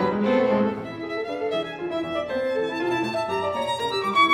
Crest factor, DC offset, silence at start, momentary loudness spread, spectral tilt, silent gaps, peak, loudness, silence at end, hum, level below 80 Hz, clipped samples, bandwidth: 18 dB; under 0.1%; 0 s; 9 LU; -5.5 dB/octave; none; -6 dBFS; -25 LUFS; 0 s; none; -62 dBFS; under 0.1%; 15.5 kHz